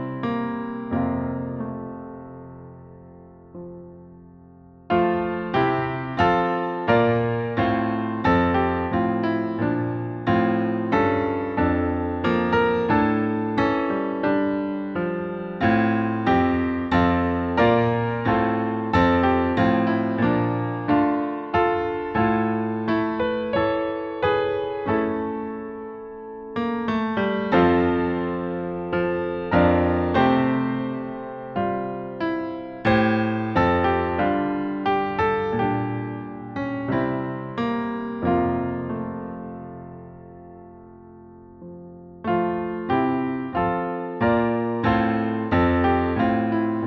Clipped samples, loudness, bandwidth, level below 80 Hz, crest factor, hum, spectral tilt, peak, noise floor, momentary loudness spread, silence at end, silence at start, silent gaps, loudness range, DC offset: under 0.1%; -23 LUFS; 6.6 kHz; -46 dBFS; 18 dB; none; -9 dB/octave; -6 dBFS; -48 dBFS; 13 LU; 0 s; 0 s; none; 8 LU; under 0.1%